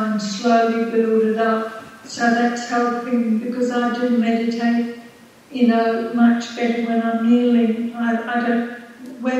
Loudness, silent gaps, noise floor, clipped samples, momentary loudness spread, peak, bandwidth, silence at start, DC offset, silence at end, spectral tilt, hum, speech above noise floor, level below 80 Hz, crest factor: -19 LUFS; none; -44 dBFS; under 0.1%; 11 LU; -4 dBFS; 8.4 kHz; 0 s; under 0.1%; 0 s; -5.5 dB/octave; none; 26 dB; -72 dBFS; 16 dB